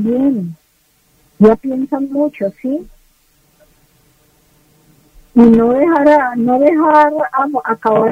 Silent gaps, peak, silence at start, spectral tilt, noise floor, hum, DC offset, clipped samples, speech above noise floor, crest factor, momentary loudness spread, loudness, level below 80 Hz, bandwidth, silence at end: none; 0 dBFS; 0 s; -8.5 dB/octave; -56 dBFS; none; under 0.1%; under 0.1%; 44 dB; 14 dB; 12 LU; -13 LUFS; -46 dBFS; 7.4 kHz; 0 s